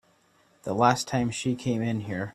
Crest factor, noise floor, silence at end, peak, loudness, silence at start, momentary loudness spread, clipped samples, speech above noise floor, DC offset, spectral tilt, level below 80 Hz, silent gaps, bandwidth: 22 dB; -64 dBFS; 0.05 s; -6 dBFS; -27 LUFS; 0.65 s; 9 LU; under 0.1%; 37 dB; under 0.1%; -5.5 dB/octave; -60 dBFS; none; 14 kHz